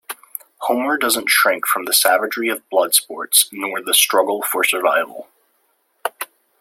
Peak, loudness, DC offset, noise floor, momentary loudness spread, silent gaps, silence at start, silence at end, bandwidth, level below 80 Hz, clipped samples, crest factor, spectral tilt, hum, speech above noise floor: 0 dBFS; -16 LUFS; under 0.1%; -64 dBFS; 16 LU; none; 0.1 s; 0.35 s; 16.5 kHz; -72 dBFS; under 0.1%; 20 dB; 0.5 dB/octave; none; 47 dB